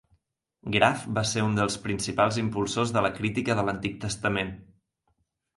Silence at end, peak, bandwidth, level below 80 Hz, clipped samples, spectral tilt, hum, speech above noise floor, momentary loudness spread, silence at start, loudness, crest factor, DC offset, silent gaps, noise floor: 0.95 s; -6 dBFS; 11.5 kHz; -54 dBFS; under 0.1%; -4.5 dB/octave; none; 48 dB; 8 LU; 0.65 s; -27 LUFS; 22 dB; under 0.1%; none; -74 dBFS